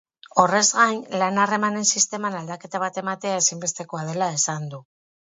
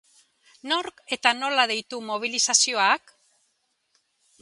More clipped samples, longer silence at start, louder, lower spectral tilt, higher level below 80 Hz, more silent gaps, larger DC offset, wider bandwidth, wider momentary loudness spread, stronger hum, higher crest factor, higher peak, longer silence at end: neither; second, 0.35 s vs 0.65 s; about the same, -22 LUFS vs -23 LUFS; first, -2.5 dB/octave vs 1 dB/octave; first, -70 dBFS vs -78 dBFS; neither; neither; second, 8 kHz vs 11.5 kHz; about the same, 13 LU vs 11 LU; neither; about the same, 22 dB vs 24 dB; about the same, 0 dBFS vs -2 dBFS; second, 0.4 s vs 1.45 s